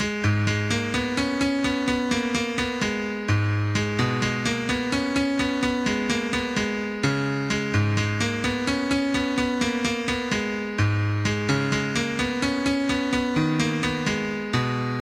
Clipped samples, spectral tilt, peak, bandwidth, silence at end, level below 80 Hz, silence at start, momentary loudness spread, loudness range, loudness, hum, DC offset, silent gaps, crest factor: under 0.1%; -5 dB/octave; -8 dBFS; 13.5 kHz; 0 s; -46 dBFS; 0 s; 2 LU; 1 LU; -24 LUFS; none; under 0.1%; none; 16 dB